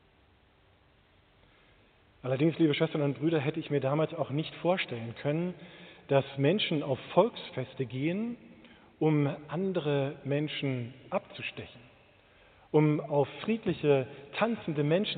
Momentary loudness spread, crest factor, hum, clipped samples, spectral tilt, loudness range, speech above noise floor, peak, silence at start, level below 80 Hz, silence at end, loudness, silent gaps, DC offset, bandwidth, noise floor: 12 LU; 22 dB; none; under 0.1%; -5.5 dB/octave; 3 LU; 34 dB; -10 dBFS; 2.25 s; -70 dBFS; 0 s; -31 LUFS; none; under 0.1%; 4.6 kHz; -64 dBFS